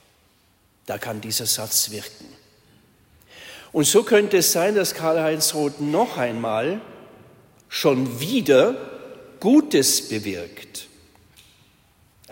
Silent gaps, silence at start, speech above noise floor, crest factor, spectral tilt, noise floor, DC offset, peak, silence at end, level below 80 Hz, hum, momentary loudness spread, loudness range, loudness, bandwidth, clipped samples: none; 0.85 s; 40 dB; 18 dB; -3 dB/octave; -61 dBFS; under 0.1%; -4 dBFS; 1.45 s; -64 dBFS; none; 19 LU; 5 LU; -20 LUFS; 16.5 kHz; under 0.1%